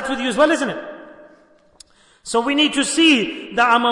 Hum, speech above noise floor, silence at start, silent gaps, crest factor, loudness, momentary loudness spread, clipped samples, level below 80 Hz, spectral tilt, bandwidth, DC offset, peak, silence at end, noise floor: none; 35 dB; 0 s; none; 16 dB; -17 LUFS; 15 LU; under 0.1%; -58 dBFS; -2.5 dB/octave; 11 kHz; under 0.1%; -4 dBFS; 0 s; -52 dBFS